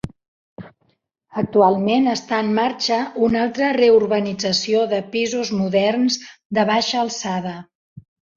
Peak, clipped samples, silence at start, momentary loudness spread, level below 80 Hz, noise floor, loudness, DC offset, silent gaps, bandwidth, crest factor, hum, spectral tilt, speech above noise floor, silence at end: -2 dBFS; under 0.1%; 0.05 s; 10 LU; -56 dBFS; -66 dBFS; -19 LUFS; under 0.1%; 0.28-0.56 s, 6.45-6.50 s, 7.75-7.96 s; 7.6 kHz; 18 dB; none; -4.5 dB/octave; 48 dB; 0.35 s